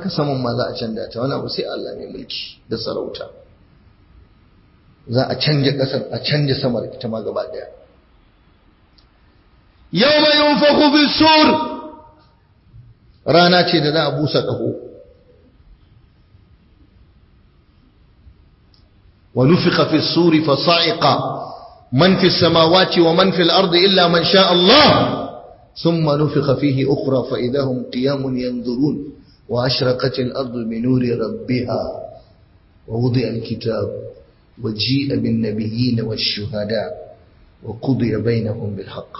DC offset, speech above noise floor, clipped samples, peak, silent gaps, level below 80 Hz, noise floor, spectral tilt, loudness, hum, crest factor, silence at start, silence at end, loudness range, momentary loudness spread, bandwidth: under 0.1%; 36 dB; under 0.1%; 0 dBFS; none; -48 dBFS; -53 dBFS; -9 dB/octave; -16 LUFS; none; 18 dB; 0 s; 0 s; 12 LU; 16 LU; 6 kHz